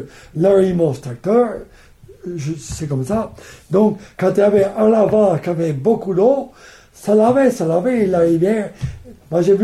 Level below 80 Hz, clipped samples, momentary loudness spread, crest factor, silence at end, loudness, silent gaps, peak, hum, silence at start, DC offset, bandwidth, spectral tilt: -44 dBFS; under 0.1%; 14 LU; 14 dB; 0 s; -16 LUFS; none; -2 dBFS; none; 0 s; under 0.1%; 13 kHz; -7.5 dB/octave